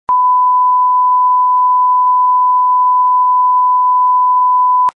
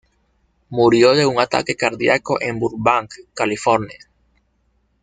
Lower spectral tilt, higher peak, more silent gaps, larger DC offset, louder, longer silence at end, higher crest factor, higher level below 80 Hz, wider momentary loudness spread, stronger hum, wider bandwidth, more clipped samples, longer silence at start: second, -3.5 dB/octave vs -5 dB/octave; second, -6 dBFS vs 0 dBFS; neither; neither; first, -10 LUFS vs -17 LUFS; second, 0.05 s vs 1.1 s; second, 4 dB vs 18 dB; second, -66 dBFS vs -54 dBFS; second, 0 LU vs 10 LU; neither; second, 2 kHz vs 9.4 kHz; neither; second, 0.1 s vs 0.7 s